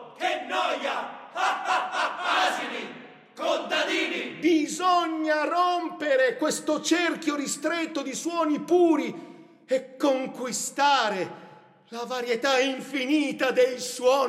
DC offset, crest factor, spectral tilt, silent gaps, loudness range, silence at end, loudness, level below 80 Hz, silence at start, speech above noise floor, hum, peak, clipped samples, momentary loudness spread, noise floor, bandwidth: under 0.1%; 16 dB; -2.5 dB/octave; none; 3 LU; 0 s; -26 LUFS; -82 dBFS; 0 s; 20 dB; none; -10 dBFS; under 0.1%; 9 LU; -45 dBFS; 15.5 kHz